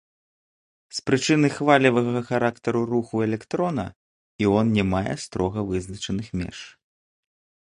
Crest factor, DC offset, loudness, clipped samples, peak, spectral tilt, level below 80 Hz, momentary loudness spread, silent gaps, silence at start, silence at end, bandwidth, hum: 22 dB; under 0.1%; -23 LUFS; under 0.1%; -2 dBFS; -6 dB/octave; -48 dBFS; 13 LU; 3.96-4.39 s; 0.95 s; 1 s; 11.5 kHz; none